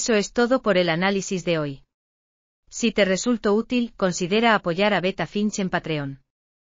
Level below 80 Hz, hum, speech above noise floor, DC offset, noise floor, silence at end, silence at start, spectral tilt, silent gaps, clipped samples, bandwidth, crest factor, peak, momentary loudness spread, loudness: -54 dBFS; none; over 68 dB; under 0.1%; under -90 dBFS; 0.55 s; 0 s; -4.5 dB/octave; 1.94-2.63 s; under 0.1%; 7.6 kHz; 18 dB; -4 dBFS; 8 LU; -22 LUFS